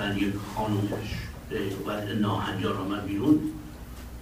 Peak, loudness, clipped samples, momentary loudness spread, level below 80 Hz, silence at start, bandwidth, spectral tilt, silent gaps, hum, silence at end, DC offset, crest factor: -10 dBFS; -29 LUFS; under 0.1%; 13 LU; -46 dBFS; 0 s; 15.5 kHz; -6.5 dB/octave; none; none; 0 s; under 0.1%; 18 dB